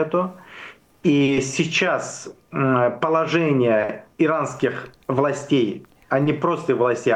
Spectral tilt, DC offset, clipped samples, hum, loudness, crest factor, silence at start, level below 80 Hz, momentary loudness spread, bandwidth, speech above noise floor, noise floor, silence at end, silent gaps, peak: -5.5 dB/octave; under 0.1%; under 0.1%; none; -21 LUFS; 14 dB; 0 s; -60 dBFS; 13 LU; 10 kHz; 22 dB; -42 dBFS; 0 s; none; -8 dBFS